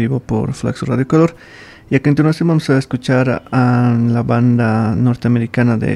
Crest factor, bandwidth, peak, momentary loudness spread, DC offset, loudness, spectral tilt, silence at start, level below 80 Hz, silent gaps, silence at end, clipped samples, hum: 14 dB; 11 kHz; 0 dBFS; 5 LU; under 0.1%; -15 LUFS; -8 dB/octave; 0 s; -44 dBFS; none; 0 s; under 0.1%; none